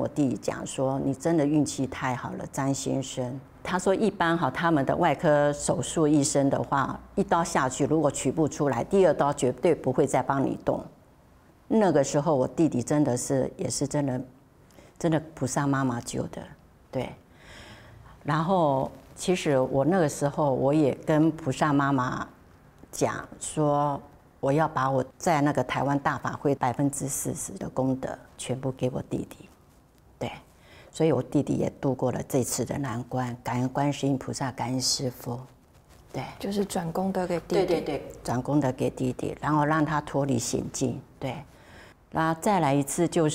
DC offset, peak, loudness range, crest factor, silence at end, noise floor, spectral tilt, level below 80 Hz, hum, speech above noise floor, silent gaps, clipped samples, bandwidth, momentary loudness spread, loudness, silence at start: under 0.1%; -10 dBFS; 6 LU; 18 dB; 0 s; -57 dBFS; -5.5 dB/octave; -54 dBFS; none; 31 dB; none; under 0.1%; 16 kHz; 11 LU; -27 LUFS; 0 s